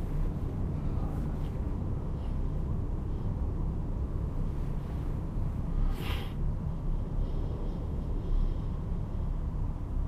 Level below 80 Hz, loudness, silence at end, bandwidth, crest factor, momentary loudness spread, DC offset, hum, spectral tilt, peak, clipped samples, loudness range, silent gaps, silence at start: -32 dBFS; -35 LUFS; 0 s; 5.4 kHz; 12 dB; 2 LU; under 0.1%; none; -8.5 dB/octave; -18 dBFS; under 0.1%; 1 LU; none; 0 s